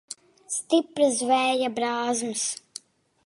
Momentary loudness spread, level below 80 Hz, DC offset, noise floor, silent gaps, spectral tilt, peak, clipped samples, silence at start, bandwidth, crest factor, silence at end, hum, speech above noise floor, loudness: 20 LU; -80 dBFS; under 0.1%; -47 dBFS; none; -2 dB/octave; -8 dBFS; under 0.1%; 0.1 s; 11.5 kHz; 18 dB; 0.7 s; none; 22 dB; -25 LUFS